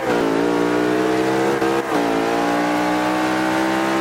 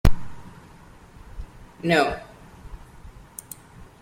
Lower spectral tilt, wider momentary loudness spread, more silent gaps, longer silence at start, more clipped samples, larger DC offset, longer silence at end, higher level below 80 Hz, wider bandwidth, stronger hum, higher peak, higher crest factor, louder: about the same, -5 dB/octave vs -5.5 dB/octave; second, 1 LU vs 28 LU; neither; about the same, 0 s vs 0.05 s; neither; neither; second, 0 s vs 0.15 s; second, -50 dBFS vs -32 dBFS; about the same, 16.5 kHz vs 16.5 kHz; neither; second, -6 dBFS vs -2 dBFS; second, 12 dB vs 22 dB; first, -19 LUFS vs -25 LUFS